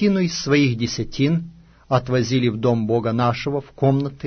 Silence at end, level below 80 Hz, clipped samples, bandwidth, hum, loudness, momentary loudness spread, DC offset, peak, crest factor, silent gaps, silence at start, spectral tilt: 0 s; -46 dBFS; under 0.1%; 6.6 kHz; none; -20 LUFS; 7 LU; under 0.1%; -4 dBFS; 16 dB; none; 0 s; -6.5 dB/octave